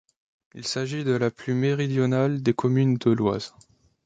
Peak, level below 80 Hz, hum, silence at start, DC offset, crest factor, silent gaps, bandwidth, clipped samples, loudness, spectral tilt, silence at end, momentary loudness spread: -8 dBFS; -60 dBFS; none; 0.55 s; under 0.1%; 18 dB; none; 9.2 kHz; under 0.1%; -24 LUFS; -6.5 dB/octave; 0.55 s; 8 LU